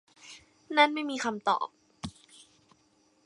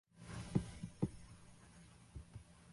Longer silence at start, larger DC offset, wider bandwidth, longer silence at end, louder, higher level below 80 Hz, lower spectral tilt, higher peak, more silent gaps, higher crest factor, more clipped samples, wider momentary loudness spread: about the same, 0.25 s vs 0.15 s; neither; about the same, 11.5 kHz vs 11.5 kHz; first, 1.15 s vs 0 s; first, -28 LUFS vs -45 LUFS; second, -66 dBFS vs -60 dBFS; second, -3 dB/octave vs -7 dB/octave; first, -8 dBFS vs -22 dBFS; neither; about the same, 24 dB vs 26 dB; neither; first, 25 LU vs 20 LU